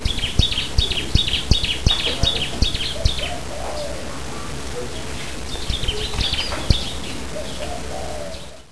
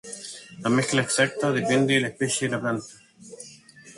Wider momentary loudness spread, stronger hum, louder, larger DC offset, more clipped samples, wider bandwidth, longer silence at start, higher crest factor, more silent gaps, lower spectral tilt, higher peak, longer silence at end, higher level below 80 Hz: second, 11 LU vs 21 LU; neither; about the same, -22 LUFS vs -24 LUFS; first, 3% vs under 0.1%; neither; about the same, 11 kHz vs 11.5 kHz; about the same, 0 s vs 0.05 s; about the same, 22 dB vs 20 dB; neither; about the same, -3.5 dB/octave vs -4 dB/octave; first, 0 dBFS vs -6 dBFS; about the same, 0 s vs 0.05 s; first, -28 dBFS vs -64 dBFS